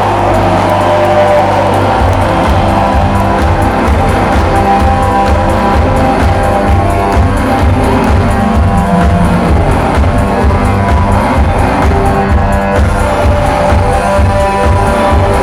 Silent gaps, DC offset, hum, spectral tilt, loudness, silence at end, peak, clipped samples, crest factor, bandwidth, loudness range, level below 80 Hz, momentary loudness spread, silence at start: none; under 0.1%; none; -7 dB/octave; -9 LUFS; 0 s; 0 dBFS; under 0.1%; 8 dB; 14.5 kHz; 1 LU; -14 dBFS; 1 LU; 0 s